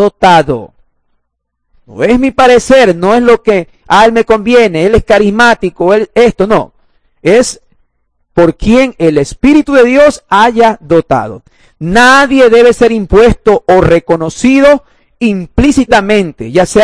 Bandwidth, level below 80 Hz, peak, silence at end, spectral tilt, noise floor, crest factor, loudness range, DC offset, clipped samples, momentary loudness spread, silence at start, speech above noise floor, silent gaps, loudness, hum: 11 kHz; -28 dBFS; 0 dBFS; 0 s; -5 dB/octave; -66 dBFS; 8 dB; 4 LU; 0.8%; 8%; 9 LU; 0 s; 59 dB; none; -7 LUFS; none